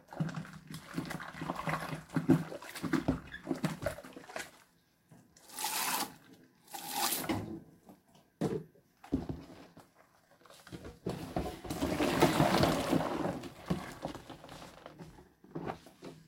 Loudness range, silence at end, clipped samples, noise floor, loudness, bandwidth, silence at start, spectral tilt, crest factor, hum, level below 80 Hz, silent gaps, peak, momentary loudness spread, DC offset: 10 LU; 0.05 s; under 0.1%; -68 dBFS; -35 LUFS; 16.5 kHz; 0.1 s; -4.5 dB/octave; 24 dB; none; -56 dBFS; none; -12 dBFS; 20 LU; under 0.1%